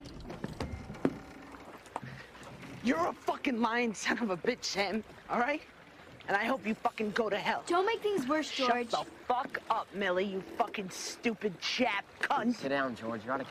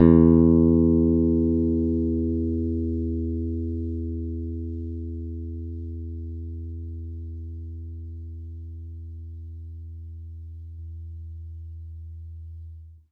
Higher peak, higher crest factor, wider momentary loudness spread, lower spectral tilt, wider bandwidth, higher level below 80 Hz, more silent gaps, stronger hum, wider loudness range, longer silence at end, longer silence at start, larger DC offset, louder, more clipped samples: second, -14 dBFS vs -4 dBFS; about the same, 20 dB vs 22 dB; second, 16 LU vs 21 LU; second, -4 dB/octave vs -13 dB/octave; first, 15 kHz vs 2.3 kHz; second, -60 dBFS vs -36 dBFS; neither; neither; second, 3 LU vs 17 LU; second, 0 s vs 0.15 s; about the same, 0 s vs 0 s; neither; second, -33 LUFS vs -24 LUFS; neither